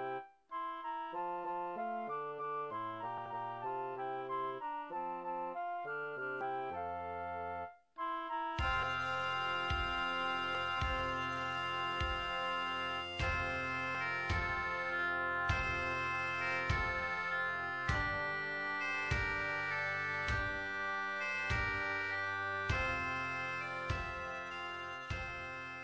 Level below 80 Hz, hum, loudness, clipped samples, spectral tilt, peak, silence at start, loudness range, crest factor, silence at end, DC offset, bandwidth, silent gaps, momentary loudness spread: -50 dBFS; none; -37 LUFS; under 0.1%; -4.5 dB/octave; -22 dBFS; 0 s; 6 LU; 16 dB; 0 s; under 0.1%; 8 kHz; none; 7 LU